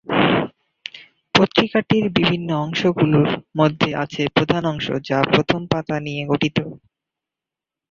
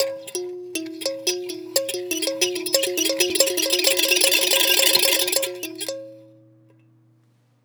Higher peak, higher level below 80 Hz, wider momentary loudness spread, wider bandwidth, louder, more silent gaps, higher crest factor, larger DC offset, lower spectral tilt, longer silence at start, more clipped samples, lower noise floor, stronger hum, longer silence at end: about the same, 0 dBFS vs 0 dBFS; first, -52 dBFS vs -76 dBFS; second, 9 LU vs 15 LU; second, 7.4 kHz vs over 20 kHz; about the same, -19 LUFS vs -19 LUFS; neither; about the same, 20 dB vs 22 dB; neither; first, -6.5 dB/octave vs 0.5 dB/octave; about the same, 0.05 s vs 0 s; neither; first, -87 dBFS vs -60 dBFS; neither; second, 1.15 s vs 1.4 s